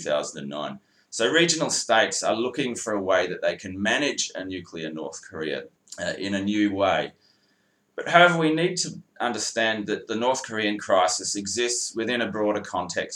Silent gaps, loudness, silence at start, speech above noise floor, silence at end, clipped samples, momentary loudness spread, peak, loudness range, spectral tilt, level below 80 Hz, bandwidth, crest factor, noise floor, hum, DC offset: none; -24 LUFS; 0 s; 42 dB; 0 s; under 0.1%; 14 LU; 0 dBFS; 5 LU; -3 dB/octave; -72 dBFS; 13.5 kHz; 24 dB; -67 dBFS; none; under 0.1%